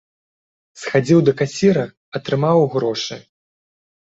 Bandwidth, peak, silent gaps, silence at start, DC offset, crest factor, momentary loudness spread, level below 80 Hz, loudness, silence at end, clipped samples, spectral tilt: 8 kHz; -2 dBFS; 1.97-2.12 s; 0.75 s; under 0.1%; 18 dB; 14 LU; -58 dBFS; -18 LUFS; 0.95 s; under 0.1%; -6.5 dB/octave